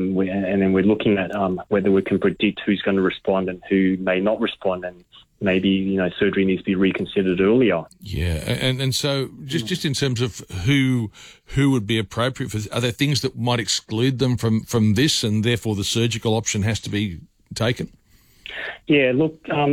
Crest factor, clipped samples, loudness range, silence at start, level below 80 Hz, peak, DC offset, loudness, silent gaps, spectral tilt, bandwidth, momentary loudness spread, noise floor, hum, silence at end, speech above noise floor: 14 dB; under 0.1%; 3 LU; 0 s; -46 dBFS; -6 dBFS; under 0.1%; -21 LUFS; none; -5.5 dB/octave; 16.5 kHz; 8 LU; -45 dBFS; none; 0 s; 25 dB